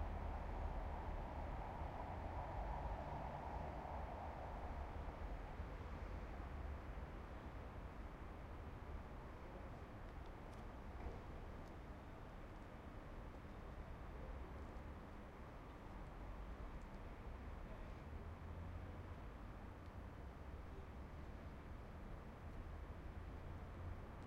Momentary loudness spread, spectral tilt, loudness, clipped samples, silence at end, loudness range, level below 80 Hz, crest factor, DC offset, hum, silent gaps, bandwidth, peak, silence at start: 7 LU; -7.5 dB/octave; -53 LUFS; under 0.1%; 0 s; 6 LU; -54 dBFS; 16 dB; under 0.1%; none; none; 15.5 kHz; -34 dBFS; 0 s